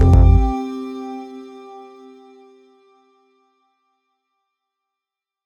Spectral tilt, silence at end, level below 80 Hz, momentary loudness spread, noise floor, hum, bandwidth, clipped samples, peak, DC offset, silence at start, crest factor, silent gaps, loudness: -9.5 dB/octave; 3.7 s; -24 dBFS; 27 LU; -86 dBFS; none; 7 kHz; under 0.1%; -2 dBFS; under 0.1%; 0 s; 18 dB; none; -18 LUFS